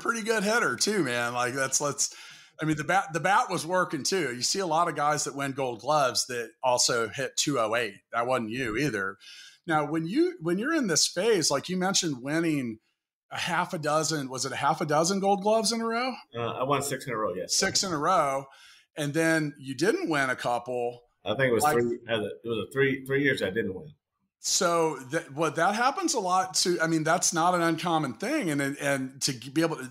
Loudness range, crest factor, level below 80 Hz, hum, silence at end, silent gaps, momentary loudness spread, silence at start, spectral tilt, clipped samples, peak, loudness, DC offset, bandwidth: 2 LU; 16 dB; -66 dBFS; none; 0 s; 13.13-13.29 s; 9 LU; 0 s; -3 dB/octave; under 0.1%; -12 dBFS; -27 LUFS; under 0.1%; 16 kHz